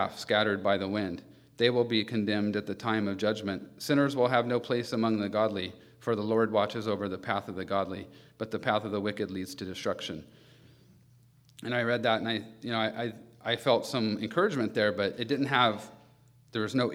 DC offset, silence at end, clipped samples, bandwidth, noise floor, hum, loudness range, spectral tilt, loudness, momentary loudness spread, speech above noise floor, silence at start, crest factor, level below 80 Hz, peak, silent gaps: under 0.1%; 0 s; under 0.1%; 16 kHz; -60 dBFS; none; 5 LU; -5.5 dB/octave; -30 LUFS; 11 LU; 31 dB; 0 s; 22 dB; -72 dBFS; -8 dBFS; none